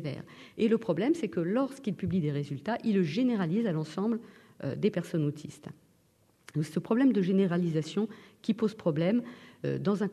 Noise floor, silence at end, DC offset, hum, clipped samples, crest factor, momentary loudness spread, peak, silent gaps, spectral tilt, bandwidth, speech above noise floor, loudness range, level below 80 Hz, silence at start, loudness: -67 dBFS; 0 s; under 0.1%; none; under 0.1%; 16 dB; 12 LU; -14 dBFS; none; -7.5 dB/octave; 12.5 kHz; 37 dB; 4 LU; -68 dBFS; 0 s; -30 LUFS